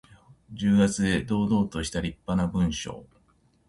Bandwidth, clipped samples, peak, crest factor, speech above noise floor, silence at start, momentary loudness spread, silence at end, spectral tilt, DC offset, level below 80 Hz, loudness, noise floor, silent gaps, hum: 11.5 kHz; under 0.1%; -10 dBFS; 16 dB; 39 dB; 0.5 s; 14 LU; 0.65 s; -5.5 dB/octave; under 0.1%; -44 dBFS; -26 LUFS; -64 dBFS; none; none